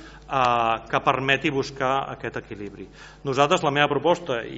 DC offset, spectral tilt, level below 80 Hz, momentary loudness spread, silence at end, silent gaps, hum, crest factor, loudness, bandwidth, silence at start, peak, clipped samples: under 0.1%; -3 dB/octave; -52 dBFS; 16 LU; 0 s; none; none; 22 dB; -23 LUFS; 8 kHz; 0 s; -2 dBFS; under 0.1%